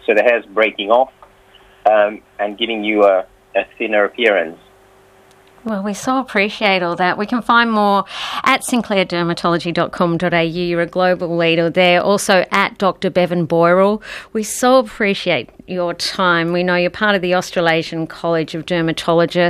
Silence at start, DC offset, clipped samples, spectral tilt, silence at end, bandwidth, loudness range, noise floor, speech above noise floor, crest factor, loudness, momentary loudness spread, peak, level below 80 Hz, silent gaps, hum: 0.1 s; under 0.1%; under 0.1%; -4.5 dB/octave; 0 s; 15 kHz; 3 LU; -48 dBFS; 32 dB; 16 dB; -16 LUFS; 9 LU; 0 dBFS; -52 dBFS; none; none